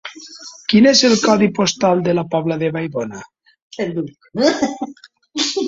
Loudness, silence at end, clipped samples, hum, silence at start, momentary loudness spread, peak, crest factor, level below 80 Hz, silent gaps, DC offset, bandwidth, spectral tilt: -16 LUFS; 0 s; under 0.1%; none; 0.05 s; 19 LU; -2 dBFS; 16 dB; -56 dBFS; 3.62-3.71 s; under 0.1%; 7.8 kHz; -4 dB/octave